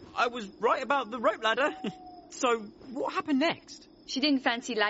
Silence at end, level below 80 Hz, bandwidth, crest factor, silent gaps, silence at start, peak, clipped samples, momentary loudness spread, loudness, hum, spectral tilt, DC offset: 0 s; -68 dBFS; 8 kHz; 18 dB; none; 0 s; -12 dBFS; under 0.1%; 14 LU; -29 LUFS; none; -1 dB/octave; under 0.1%